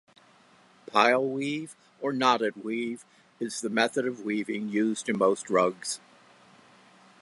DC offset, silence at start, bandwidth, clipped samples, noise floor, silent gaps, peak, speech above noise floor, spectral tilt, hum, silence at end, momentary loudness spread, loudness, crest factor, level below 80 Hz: under 0.1%; 0.95 s; 11.5 kHz; under 0.1%; -59 dBFS; none; -6 dBFS; 32 dB; -4 dB/octave; none; 1.25 s; 12 LU; -28 LUFS; 22 dB; -80 dBFS